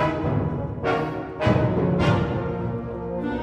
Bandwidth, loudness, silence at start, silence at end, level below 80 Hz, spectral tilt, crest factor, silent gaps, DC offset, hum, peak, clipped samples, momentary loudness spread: 9 kHz; -24 LUFS; 0 s; 0 s; -40 dBFS; -8.5 dB/octave; 16 dB; none; under 0.1%; none; -8 dBFS; under 0.1%; 8 LU